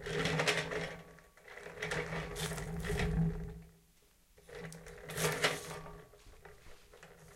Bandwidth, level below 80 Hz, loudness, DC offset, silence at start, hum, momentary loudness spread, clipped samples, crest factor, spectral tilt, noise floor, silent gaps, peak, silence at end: 16 kHz; -50 dBFS; -37 LUFS; under 0.1%; 0 s; none; 25 LU; under 0.1%; 24 dB; -4 dB/octave; -67 dBFS; none; -14 dBFS; 0 s